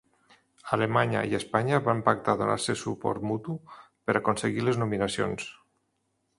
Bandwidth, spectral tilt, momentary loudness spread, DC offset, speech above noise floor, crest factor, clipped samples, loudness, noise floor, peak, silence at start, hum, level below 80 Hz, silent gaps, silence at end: 11.5 kHz; -5.5 dB/octave; 11 LU; under 0.1%; 48 dB; 22 dB; under 0.1%; -28 LUFS; -76 dBFS; -6 dBFS; 0.65 s; none; -60 dBFS; none; 0.85 s